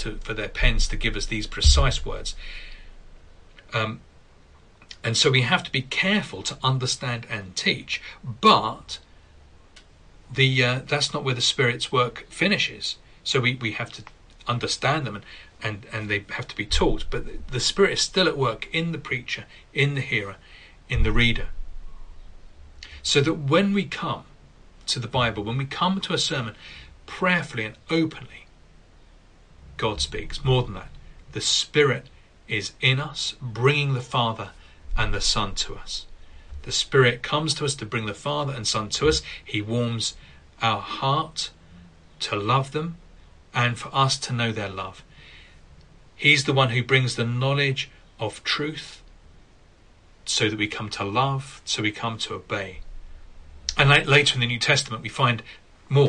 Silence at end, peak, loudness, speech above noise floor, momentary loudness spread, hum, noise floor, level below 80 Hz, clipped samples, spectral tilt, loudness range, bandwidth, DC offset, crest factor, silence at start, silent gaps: 0 s; -4 dBFS; -24 LUFS; 29 dB; 14 LU; none; -53 dBFS; -36 dBFS; under 0.1%; -4 dB/octave; 5 LU; 10.5 kHz; under 0.1%; 22 dB; 0 s; none